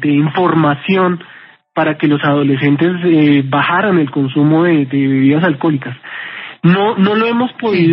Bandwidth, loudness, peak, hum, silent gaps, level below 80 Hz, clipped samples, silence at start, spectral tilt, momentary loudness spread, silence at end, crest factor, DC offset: 5.6 kHz; -13 LUFS; 0 dBFS; none; none; -66 dBFS; under 0.1%; 0 s; -5.5 dB/octave; 8 LU; 0 s; 12 dB; under 0.1%